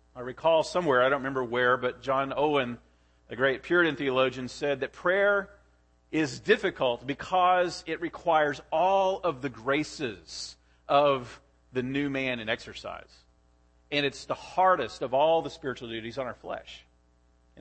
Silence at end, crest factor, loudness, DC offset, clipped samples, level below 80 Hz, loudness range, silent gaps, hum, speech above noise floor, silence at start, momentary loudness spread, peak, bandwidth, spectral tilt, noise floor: 0 s; 20 dB; -27 LUFS; under 0.1%; under 0.1%; -60 dBFS; 3 LU; none; 60 Hz at -60 dBFS; 37 dB; 0.15 s; 14 LU; -10 dBFS; 8.8 kHz; -5 dB/octave; -64 dBFS